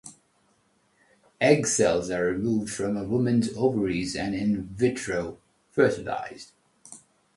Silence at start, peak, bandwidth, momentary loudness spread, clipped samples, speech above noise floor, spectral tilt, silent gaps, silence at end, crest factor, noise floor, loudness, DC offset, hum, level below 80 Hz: 0.05 s; -6 dBFS; 11.5 kHz; 17 LU; under 0.1%; 42 dB; -5 dB/octave; none; 0.4 s; 20 dB; -67 dBFS; -26 LUFS; under 0.1%; none; -54 dBFS